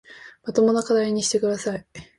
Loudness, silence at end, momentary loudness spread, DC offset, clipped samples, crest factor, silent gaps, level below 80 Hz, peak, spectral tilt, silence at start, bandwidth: -22 LUFS; 0.15 s; 12 LU; under 0.1%; under 0.1%; 16 dB; none; -60 dBFS; -6 dBFS; -4 dB/octave; 0.1 s; 11.5 kHz